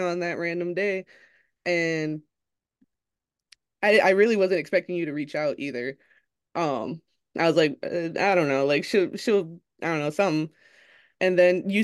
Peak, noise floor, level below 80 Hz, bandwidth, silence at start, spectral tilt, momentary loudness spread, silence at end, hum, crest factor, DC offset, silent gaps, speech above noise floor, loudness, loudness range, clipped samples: -6 dBFS; -88 dBFS; -76 dBFS; 12.5 kHz; 0 s; -5.5 dB/octave; 13 LU; 0 s; none; 18 dB; under 0.1%; none; 64 dB; -24 LUFS; 5 LU; under 0.1%